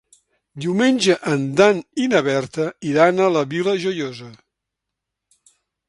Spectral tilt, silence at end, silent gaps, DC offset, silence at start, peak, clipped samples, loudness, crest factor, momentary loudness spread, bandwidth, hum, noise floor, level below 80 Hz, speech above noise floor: -5 dB/octave; 1.55 s; none; under 0.1%; 0.55 s; 0 dBFS; under 0.1%; -19 LUFS; 20 dB; 10 LU; 11.5 kHz; none; -82 dBFS; -64 dBFS; 64 dB